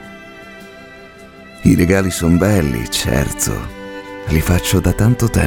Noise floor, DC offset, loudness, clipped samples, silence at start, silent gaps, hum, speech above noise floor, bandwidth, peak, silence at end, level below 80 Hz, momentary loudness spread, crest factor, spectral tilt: -38 dBFS; under 0.1%; -15 LUFS; under 0.1%; 0 s; none; none; 24 dB; 19 kHz; 0 dBFS; 0 s; -30 dBFS; 22 LU; 16 dB; -5.5 dB/octave